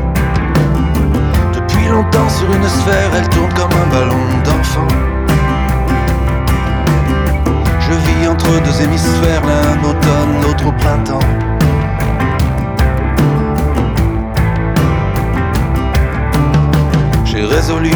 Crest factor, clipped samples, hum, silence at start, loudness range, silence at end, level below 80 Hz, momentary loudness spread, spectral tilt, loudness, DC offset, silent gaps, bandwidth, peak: 12 dB; under 0.1%; none; 0 s; 2 LU; 0 s; -18 dBFS; 3 LU; -6.5 dB/octave; -13 LUFS; under 0.1%; none; over 20 kHz; 0 dBFS